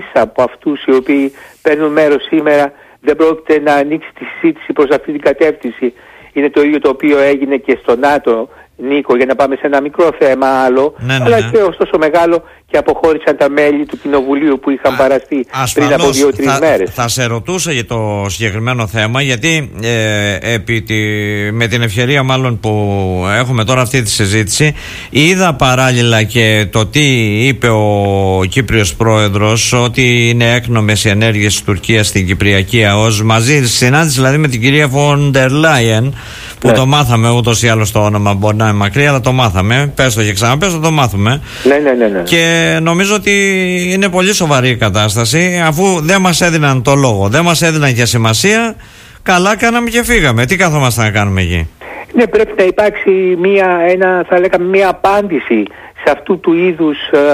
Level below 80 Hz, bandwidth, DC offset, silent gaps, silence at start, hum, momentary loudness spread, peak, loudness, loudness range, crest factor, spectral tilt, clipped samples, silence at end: -36 dBFS; 15.5 kHz; under 0.1%; none; 0 s; none; 6 LU; 0 dBFS; -11 LUFS; 3 LU; 10 dB; -5 dB/octave; under 0.1%; 0 s